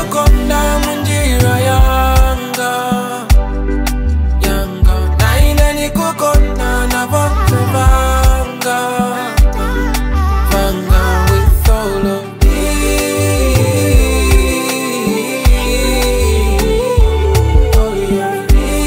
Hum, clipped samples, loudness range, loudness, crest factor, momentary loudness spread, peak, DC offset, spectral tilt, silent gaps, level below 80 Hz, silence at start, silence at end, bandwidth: none; under 0.1%; 1 LU; -13 LUFS; 10 dB; 5 LU; 0 dBFS; under 0.1%; -5 dB/octave; none; -14 dBFS; 0 s; 0 s; 16.5 kHz